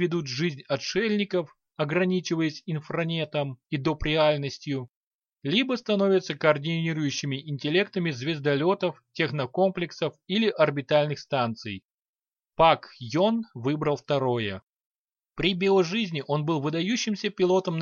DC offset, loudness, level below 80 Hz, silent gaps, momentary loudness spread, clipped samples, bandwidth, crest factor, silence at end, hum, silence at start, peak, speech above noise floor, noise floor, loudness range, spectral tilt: under 0.1%; -26 LUFS; -54 dBFS; 4.96-5.22 s, 11.84-12.14 s, 14.63-14.73 s, 14.86-15.08 s; 9 LU; under 0.1%; 7.2 kHz; 22 dB; 0 s; none; 0 s; -6 dBFS; over 64 dB; under -90 dBFS; 2 LU; -5.5 dB/octave